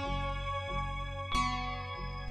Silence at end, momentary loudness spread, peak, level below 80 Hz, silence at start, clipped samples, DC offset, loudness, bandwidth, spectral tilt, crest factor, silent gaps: 0 s; 7 LU; -18 dBFS; -40 dBFS; 0 s; under 0.1%; under 0.1%; -36 LUFS; 11.5 kHz; -4.5 dB/octave; 16 dB; none